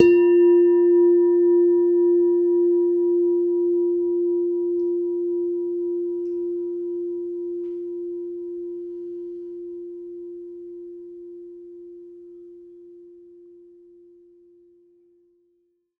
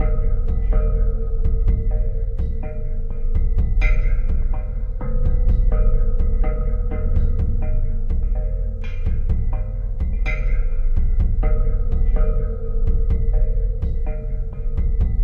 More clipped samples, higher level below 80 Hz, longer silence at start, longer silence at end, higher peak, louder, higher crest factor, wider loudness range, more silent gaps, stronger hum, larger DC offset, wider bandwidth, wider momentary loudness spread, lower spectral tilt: neither; second, -66 dBFS vs -18 dBFS; about the same, 0 s vs 0 s; first, 2.9 s vs 0 s; first, 0 dBFS vs -6 dBFS; first, -21 LUFS vs -24 LUFS; first, 22 dB vs 12 dB; first, 22 LU vs 2 LU; neither; neither; neither; about the same, 2.9 kHz vs 2.7 kHz; first, 23 LU vs 6 LU; second, -8 dB/octave vs -9.5 dB/octave